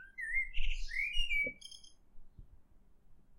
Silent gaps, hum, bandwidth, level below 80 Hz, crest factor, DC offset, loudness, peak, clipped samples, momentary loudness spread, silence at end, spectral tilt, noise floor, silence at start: none; none; 11 kHz; -42 dBFS; 18 dB; under 0.1%; -36 LUFS; -20 dBFS; under 0.1%; 18 LU; 0.15 s; -2 dB/octave; -60 dBFS; 0 s